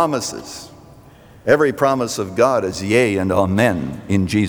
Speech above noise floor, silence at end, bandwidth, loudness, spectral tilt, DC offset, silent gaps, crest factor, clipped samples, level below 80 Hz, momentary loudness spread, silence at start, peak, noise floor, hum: 27 dB; 0 s; over 20 kHz; -18 LUFS; -5.5 dB/octave; under 0.1%; none; 16 dB; under 0.1%; -50 dBFS; 11 LU; 0 s; -2 dBFS; -44 dBFS; none